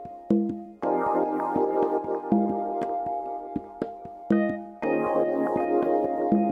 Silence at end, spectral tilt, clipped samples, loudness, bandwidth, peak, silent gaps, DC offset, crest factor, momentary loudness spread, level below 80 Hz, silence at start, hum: 0 s; -9.5 dB/octave; under 0.1%; -27 LUFS; 5.2 kHz; -8 dBFS; none; under 0.1%; 18 dB; 9 LU; -62 dBFS; 0 s; none